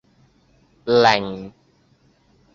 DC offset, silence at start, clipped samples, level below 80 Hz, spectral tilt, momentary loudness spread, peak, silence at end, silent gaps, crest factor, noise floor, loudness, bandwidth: under 0.1%; 0.85 s; under 0.1%; -58 dBFS; -4.5 dB/octave; 21 LU; -2 dBFS; 1.05 s; none; 22 dB; -59 dBFS; -18 LUFS; 7.4 kHz